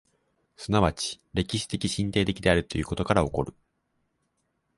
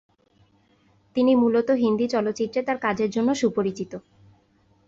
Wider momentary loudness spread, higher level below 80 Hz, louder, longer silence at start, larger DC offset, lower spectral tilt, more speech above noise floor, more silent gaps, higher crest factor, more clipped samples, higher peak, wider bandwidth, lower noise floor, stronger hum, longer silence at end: second, 8 LU vs 11 LU; first, -44 dBFS vs -64 dBFS; second, -27 LUFS vs -23 LUFS; second, 0.6 s vs 1.15 s; neither; about the same, -5 dB/octave vs -6 dB/octave; first, 49 dB vs 39 dB; neither; first, 22 dB vs 14 dB; neither; first, -6 dBFS vs -10 dBFS; first, 11.5 kHz vs 7.8 kHz; first, -75 dBFS vs -62 dBFS; neither; first, 1.25 s vs 0.9 s